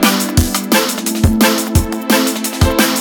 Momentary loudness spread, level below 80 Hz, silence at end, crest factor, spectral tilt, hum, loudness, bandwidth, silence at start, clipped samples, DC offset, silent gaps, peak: 4 LU; -24 dBFS; 0 s; 14 dB; -4 dB/octave; none; -14 LUFS; over 20 kHz; 0 s; under 0.1%; under 0.1%; none; 0 dBFS